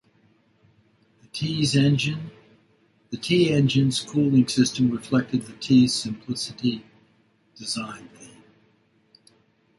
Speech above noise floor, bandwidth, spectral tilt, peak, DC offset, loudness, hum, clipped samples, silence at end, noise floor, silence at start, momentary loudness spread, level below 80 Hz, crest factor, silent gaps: 41 dB; 11.5 kHz; -5.5 dB/octave; -6 dBFS; under 0.1%; -23 LUFS; none; under 0.1%; 1.55 s; -63 dBFS; 1.35 s; 17 LU; -60 dBFS; 18 dB; none